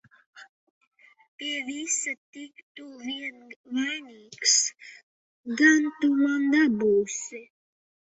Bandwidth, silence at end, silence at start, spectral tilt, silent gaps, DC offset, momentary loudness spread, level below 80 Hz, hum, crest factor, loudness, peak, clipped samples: 8.4 kHz; 0.7 s; 0.35 s; -1.5 dB/octave; 0.49-0.81 s, 0.87-0.91 s, 1.28-1.38 s, 2.18-2.33 s, 2.63-2.75 s, 3.56-3.64 s, 5.03-5.44 s; under 0.1%; 24 LU; -72 dBFS; none; 20 dB; -25 LUFS; -6 dBFS; under 0.1%